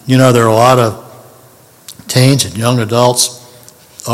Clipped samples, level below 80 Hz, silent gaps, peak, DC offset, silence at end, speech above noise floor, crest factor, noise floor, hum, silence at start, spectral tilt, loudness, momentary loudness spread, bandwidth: 0.6%; -50 dBFS; none; 0 dBFS; under 0.1%; 0 s; 33 dB; 12 dB; -42 dBFS; none; 0.05 s; -5 dB/octave; -10 LUFS; 13 LU; 16 kHz